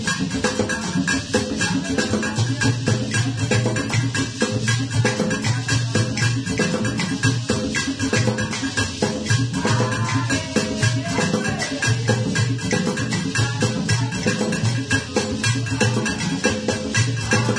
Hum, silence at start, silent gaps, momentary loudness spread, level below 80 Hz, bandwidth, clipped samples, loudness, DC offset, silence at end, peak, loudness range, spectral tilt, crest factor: none; 0 s; none; 2 LU; -44 dBFS; 10.5 kHz; under 0.1%; -21 LUFS; under 0.1%; 0 s; -4 dBFS; 0 LU; -4.5 dB/octave; 18 dB